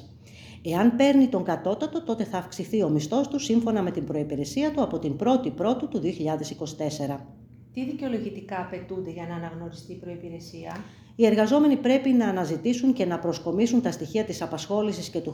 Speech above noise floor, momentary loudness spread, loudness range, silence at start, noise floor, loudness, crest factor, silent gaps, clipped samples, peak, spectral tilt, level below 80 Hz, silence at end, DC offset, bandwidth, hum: 21 dB; 18 LU; 10 LU; 0 s; -47 dBFS; -25 LUFS; 20 dB; none; under 0.1%; -6 dBFS; -6 dB/octave; -58 dBFS; 0 s; under 0.1%; 15 kHz; none